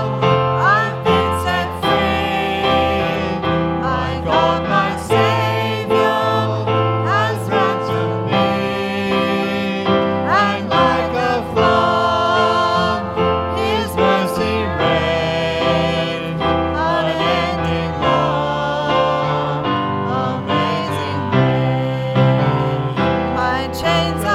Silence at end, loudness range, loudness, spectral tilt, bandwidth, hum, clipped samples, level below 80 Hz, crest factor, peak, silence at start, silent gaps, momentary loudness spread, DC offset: 0 s; 2 LU; -17 LUFS; -6 dB/octave; 15.5 kHz; none; under 0.1%; -38 dBFS; 16 dB; -2 dBFS; 0 s; none; 5 LU; under 0.1%